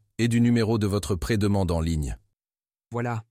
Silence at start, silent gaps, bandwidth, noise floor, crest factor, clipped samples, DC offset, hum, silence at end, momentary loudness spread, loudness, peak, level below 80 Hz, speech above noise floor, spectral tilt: 0.2 s; none; 15.5 kHz; under -90 dBFS; 14 dB; under 0.1%; under 0.1%; none; 0.1 s; 12 LU; -25 LUFS; -12 dBFS; -40 dBFS; over 66 dB; -6.5 dB/octave